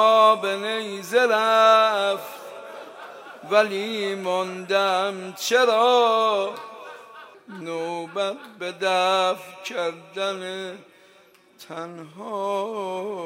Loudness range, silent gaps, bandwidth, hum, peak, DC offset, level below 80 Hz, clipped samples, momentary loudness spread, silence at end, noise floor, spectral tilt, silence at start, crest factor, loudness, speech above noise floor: 9 LU; none; 16 kHz; none; -4 dBFS; under 0.1%; -84 dBFS; under 0.1%; 21 LU; 0 s; -55 dBFS; -3 dB/octave; 0 s; 18 dB; -22 LUFS; 32 dB